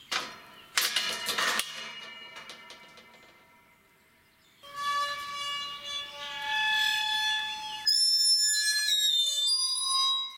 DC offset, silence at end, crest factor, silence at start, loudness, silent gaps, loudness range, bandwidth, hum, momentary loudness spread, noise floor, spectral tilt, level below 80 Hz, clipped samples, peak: under 0.1%; 0 s; 22 dB; 0 s; -26 LUFS; none; 14 LU; 16 kHz; none; 20 LU; -63 dBFS; 2.5 dB/octave; -74 dBFS; under 0.1%; -10 dBFS